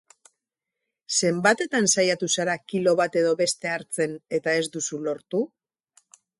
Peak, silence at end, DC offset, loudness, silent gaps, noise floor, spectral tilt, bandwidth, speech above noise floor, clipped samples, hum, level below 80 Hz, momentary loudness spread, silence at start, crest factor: -6 dBFS; 0.95 s; under 0.1%; -24 LUFS; none; -85 dBFS; -3 dB/octave; 11.5 kHz; 61 dB; under 0.1%; none; -72 dBFS; 8 LU; 1.1 s; 20 dB